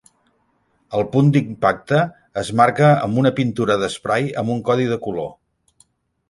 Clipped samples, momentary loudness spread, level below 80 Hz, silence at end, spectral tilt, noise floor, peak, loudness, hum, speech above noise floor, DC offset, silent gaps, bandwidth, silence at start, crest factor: under 0.1%; 10 LU; -54 dBFS; 0.95 s; -7 dB/octave; -64 dBFS; -2 dBFS; -19 LUFS; none; 46 dB; under 0.1%; none; 11.5 kHz; 0.9 s; 18 dB